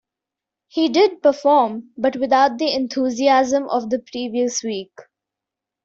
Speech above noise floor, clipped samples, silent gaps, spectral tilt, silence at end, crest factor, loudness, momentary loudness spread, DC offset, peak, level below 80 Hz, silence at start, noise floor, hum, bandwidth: 67 dB; under 0.1%; none; -3 dB/octave; 0.85 s; 16 dB; -19 LUFS; 9 LU; under 0.1%; -4 dBFS; -64 dBFS; 0.75 s; -86 dBFS; none; 7.8 kHz